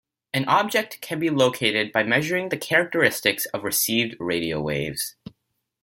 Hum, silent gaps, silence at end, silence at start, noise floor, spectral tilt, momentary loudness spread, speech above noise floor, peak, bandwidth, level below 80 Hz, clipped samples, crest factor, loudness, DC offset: none; none; 0.7 s; 0.35 s; -76 dBFS; -3.5 dB/octave; 7 LU; 53 dB; -2 dBFS; 17 kHz; -58 dBFS; under 0.1%; 20 dB; -22 LUFS; under 0.1%